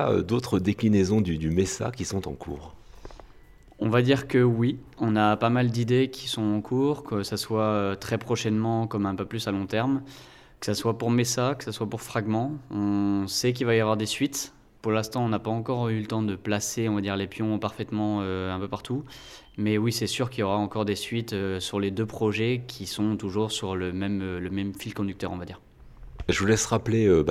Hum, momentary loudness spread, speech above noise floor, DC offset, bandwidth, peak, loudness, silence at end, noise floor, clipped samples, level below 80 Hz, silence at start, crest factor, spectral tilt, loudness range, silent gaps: none; 9 LU; 25 dB; under 0.1%; 15.5 kHz; -8 dBFS; -27 LUFS; 0 s; -51 dBFS; under 0.1%; -52 dBFS; 0 s; 18 dB; -5.5 dB/octave; 4 LU; none